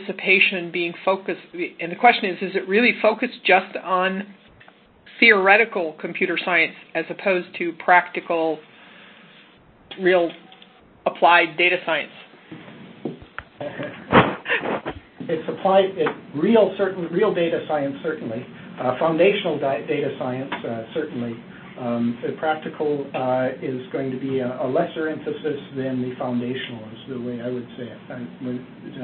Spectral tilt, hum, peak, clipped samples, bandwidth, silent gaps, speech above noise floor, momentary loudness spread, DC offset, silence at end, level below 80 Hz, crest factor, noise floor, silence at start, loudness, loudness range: -10 dB/octave; none; 0 dBFS; under 0.1%; 4.6 kHz; none; 30 dB; 18 LU; under 0.1%; 0 s; -58 dBFS; 22 dB; -51 dBFS; 0 s; -21 LUFS; 7 LU